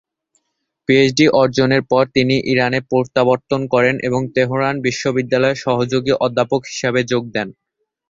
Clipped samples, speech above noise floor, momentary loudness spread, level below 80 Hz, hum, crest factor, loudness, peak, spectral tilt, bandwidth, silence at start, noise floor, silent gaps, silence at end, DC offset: under 0.1%; 57 dB; 6 LU; -52 dBFS; none; 16 dB; -16 LUFS; 0 dBFS; -5.5 dB/octave; 7.8 kHz; 0.9 s; -73 dBFS; none; 0.6 s; under 0.1%